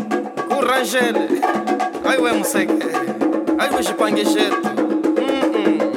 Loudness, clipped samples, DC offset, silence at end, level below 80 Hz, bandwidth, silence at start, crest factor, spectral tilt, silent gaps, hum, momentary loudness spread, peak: -18 LUFS; under 0.1%; under 0.1%; 0 s; -60 dBFS; 16.5 kHz; 0 s; 14 dB; -3.5 dB/octave; none; none; 3 LU; -4 dBFS